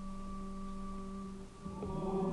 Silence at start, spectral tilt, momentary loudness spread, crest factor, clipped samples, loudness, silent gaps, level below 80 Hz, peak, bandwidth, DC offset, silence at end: 0 s; -8 dB/octave; 9 LU; 16 dB; under 0.1%; -43 LUFS; none; -48 dBFS; -26 dBFS; 11.5 kHz; under 0.1%; 0 s